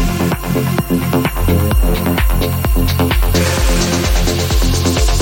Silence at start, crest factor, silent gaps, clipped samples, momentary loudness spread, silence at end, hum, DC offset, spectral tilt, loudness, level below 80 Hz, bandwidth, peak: 0 s; 12 dB; none; under 0.1%; 2 LU; 0 s; none; under 0.1%; -5 dB/octave; -15 LUFS; -16 dBFS; 17 kHz; -2 dBFS